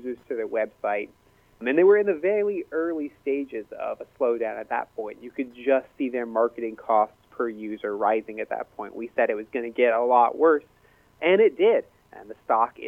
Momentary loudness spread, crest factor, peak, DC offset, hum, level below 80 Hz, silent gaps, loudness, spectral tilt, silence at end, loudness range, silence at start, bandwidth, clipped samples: 14 LU; 20 dB; -6 dBFS; under 0.1%; none; -68 dBFS; none; -25 LUFS; -7 dB/octave; 0 s; 6 LU; 0 s; 3.8 kHz; under 0.1%